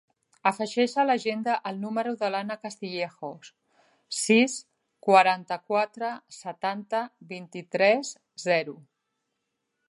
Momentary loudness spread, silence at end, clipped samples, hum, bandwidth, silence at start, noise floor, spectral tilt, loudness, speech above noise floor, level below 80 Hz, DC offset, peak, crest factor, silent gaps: 17 LU; 1.1 s; under 0.1%; none; 11.5 kHz; 0.45 s; -80 dBFS; -3.5 dB/octave; -26 LUFS; 54 dB; -84 dBFS; under 0.1%; -6 dBFS; 22 dB; none